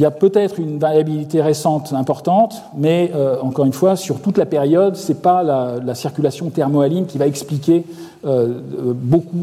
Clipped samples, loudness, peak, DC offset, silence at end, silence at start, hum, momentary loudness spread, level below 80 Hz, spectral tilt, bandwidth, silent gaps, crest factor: under 0.1%; -17 LUFS; -2 dBFS; under 0.1%; 0 s; 0 s; none; 6 LU; -62 dBFS; -7 dB/octave; 15.5 kHz; none; 14 dB